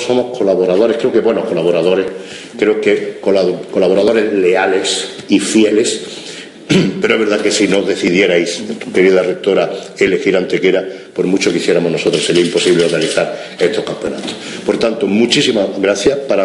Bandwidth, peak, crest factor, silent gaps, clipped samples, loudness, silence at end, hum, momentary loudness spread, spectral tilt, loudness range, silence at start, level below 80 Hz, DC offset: 11.5 kHz; 0 dBFS; 14 dB; none; under 0.1%; -13 LUFS; 0 s; none; 9 LU; -4.5 dB/octave; 1 LU; 0 s; -52 dBFS; under 0.1%